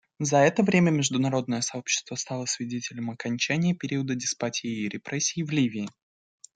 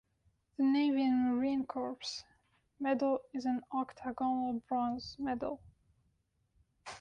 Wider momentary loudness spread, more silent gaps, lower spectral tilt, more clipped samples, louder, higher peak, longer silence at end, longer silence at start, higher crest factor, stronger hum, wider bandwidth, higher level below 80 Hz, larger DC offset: about the same, 11 LU vs 12 LU; neither; about the same, -4.5 dB/octave vs -5 dB/octave; neither; first, -26 LUFS vs -35 LUFS; first, -8 dBFS vs -22 dBFS; first, 0.7 s vs 0 s; second, 0.2 s vs 0.6 s; first, 20 dB vs 14 dB; neither; about the same, 9.6 kHz vs 9.4 kHz; about the same, -68 dBFS vs -68 dBFS; neither